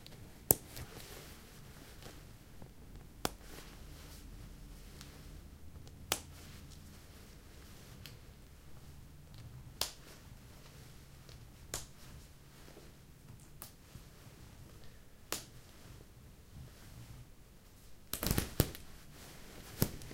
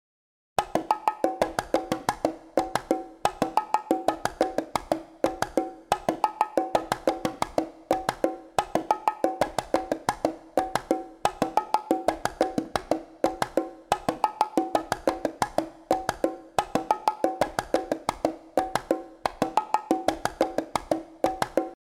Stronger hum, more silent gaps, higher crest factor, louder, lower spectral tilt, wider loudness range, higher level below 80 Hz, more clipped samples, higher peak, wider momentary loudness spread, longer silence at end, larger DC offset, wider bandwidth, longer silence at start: neither; neither; first, 44 dB vs 22 dB; second, -42 LUFS vs -28 LUFS; about the same, -3.5 dB/octave vs -4.5 dB/octave; first, 11 LU vs 0 LU; about the same, -54 dBFS vs -54 dBFS; neither; first, 0 dBFS vs -6 dBFS; first, 20 LU vs 5 LU; second, 0 s vs 0.15 s; neither; second, 16.5 kHz vs 18.5 kHz; second, 0 s vs 0.6 s